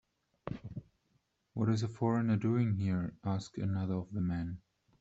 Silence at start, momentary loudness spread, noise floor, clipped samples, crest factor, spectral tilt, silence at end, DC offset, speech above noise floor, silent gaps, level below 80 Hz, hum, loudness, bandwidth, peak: 0.45 s; 15 LU; -77 dBFS; under 0.1%; 16 dB; -8 dB/octave; 0.4 s; under 0.1%; 44 dB; none; -62 dBFS; none; -35 LUFS; 8 kHz; -18 dBFS